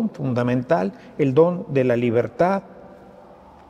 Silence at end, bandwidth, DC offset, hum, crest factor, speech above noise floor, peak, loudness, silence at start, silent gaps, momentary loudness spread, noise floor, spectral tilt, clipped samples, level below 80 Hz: 0.8 s; 8.4 kHz; under 0.1%; none; 18 dB; 26 dB; -4 dBFS; -21 LUFS; 0 s; none; 6 LU; -46 dBFS; -9 dB/octave; under 0.1%; -58 dBFS